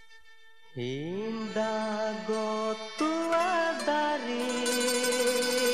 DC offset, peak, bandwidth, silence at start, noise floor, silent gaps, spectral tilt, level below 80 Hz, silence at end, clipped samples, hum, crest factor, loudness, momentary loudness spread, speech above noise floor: 0.3%; -14 dBFS; 14.5 kHz; 0.1 s; -59 dBFS; none; -3 dB/octave; -72 dBFS; 0 s; under 0.1%; none; 16 dB; -29 LUFS; 8 LU; 27 dB